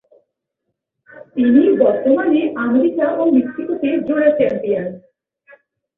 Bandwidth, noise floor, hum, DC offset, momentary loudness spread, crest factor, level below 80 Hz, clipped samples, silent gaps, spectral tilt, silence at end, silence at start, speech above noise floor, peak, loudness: 3.9 kHz; -76 dBFS; none; under 0.1%; 9 LU; 16 dB; -60 dBFS; under 0.1%; none; -9.5 dB/octave; 1 s; 1.15 s; 61 dB; -2 dBFS; -16 LUFS